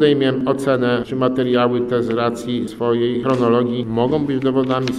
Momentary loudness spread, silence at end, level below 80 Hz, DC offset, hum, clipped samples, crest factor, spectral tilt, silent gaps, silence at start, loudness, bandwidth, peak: 4 LU; 0 s; -50 dBFS; under 0.1%; none; under 0.1%; 14 dB; -7 dB/octave; none; 0 s; -18 LUFS; 12.5 kHz; -2 dBFS